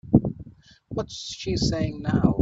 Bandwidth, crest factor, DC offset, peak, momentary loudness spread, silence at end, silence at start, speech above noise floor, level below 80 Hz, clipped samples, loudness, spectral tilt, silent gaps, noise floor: 8 kHz; 22 dB; under 0.1%; -2 dBFS; 13 LU; 0 s; 0.05 s; 23 dB; -42 dBFS; under 0.1%; -26 LUFS; -6.5 dB/octave; none; -48 dBFS